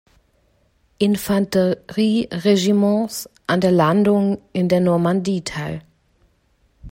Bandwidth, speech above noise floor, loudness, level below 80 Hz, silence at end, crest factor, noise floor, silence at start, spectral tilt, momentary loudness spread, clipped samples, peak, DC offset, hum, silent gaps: 16.5 kHz; 43 dB; -19 LUFS; -52 dBFS; 0.05 s; 16 dB; -61 dBFS; 1 s; -6.5 dB/octave; 11 LU; under 0.1%; -4 dBFS; under 0.1%; none; none